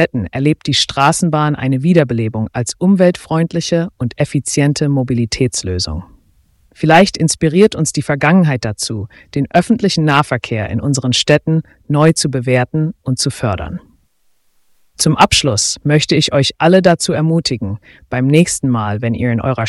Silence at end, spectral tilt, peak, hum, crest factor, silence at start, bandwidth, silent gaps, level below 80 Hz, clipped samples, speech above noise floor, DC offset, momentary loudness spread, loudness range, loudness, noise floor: 0 s; -5 dB/octave; 0 dBFS; none; 14 dB; 0 s; 12 kHz; none; -40 dBFS; under 0.1%; 44 dB; under 0.1%; 9 LU; 4 LU; -14 LUFS; -58 dBFS